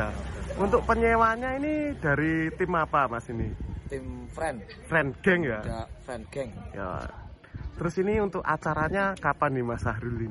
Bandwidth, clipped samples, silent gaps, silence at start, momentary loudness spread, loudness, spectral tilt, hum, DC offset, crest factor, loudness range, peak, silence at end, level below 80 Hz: 11.5 kHz; under 0.1%; none; 0 s; 14 LU; -28 LUFS; -7 dB/octave; none; under 0.1%; 20 dB; 5 LU; -8 dBFS; 0 s; -42 dBFS